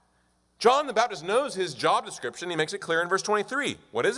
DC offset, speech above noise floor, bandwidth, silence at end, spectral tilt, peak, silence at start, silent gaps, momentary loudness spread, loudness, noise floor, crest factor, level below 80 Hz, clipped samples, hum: under 0.1%; 41 dB; 11.5 kHz; 0 s; -3 dB/octave; -8 dBFS; 0.6 s; none; 8 LU; -26 LUFS; -68 dBFS; 18 dB; -72 dBFS; under 0.1%; none